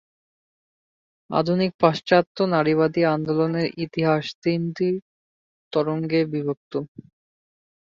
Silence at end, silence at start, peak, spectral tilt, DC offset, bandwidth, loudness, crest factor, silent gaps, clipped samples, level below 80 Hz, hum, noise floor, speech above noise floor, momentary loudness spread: 1.1 s; 1.3 s; -4 dBFS; -7.5 dB/octave; under 0.1%; 7.4 kHz; -23 LUFS; 20 dB; 1.74-1.79 s, 2.27-2.35 s, 4.35-4.42 s, 5.02-5.71 s, 6.57-6.71 s; under 0.1%; -64 dBFS; none; under -90 dBFS; over 68 dB; 8 LU